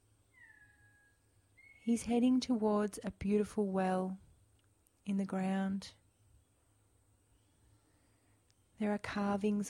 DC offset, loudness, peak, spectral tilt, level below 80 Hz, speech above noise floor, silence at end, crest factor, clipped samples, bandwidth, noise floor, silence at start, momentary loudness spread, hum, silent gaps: under 0.1%; -35 LUFS; -22 dBFS; -6.5 dB/octave; -66 dBFS; 38 dB; 0 s; 16 dB; under 0.1%; 12.5 kHz; -72 dBFS; 0.4 s; 12 LU; none; none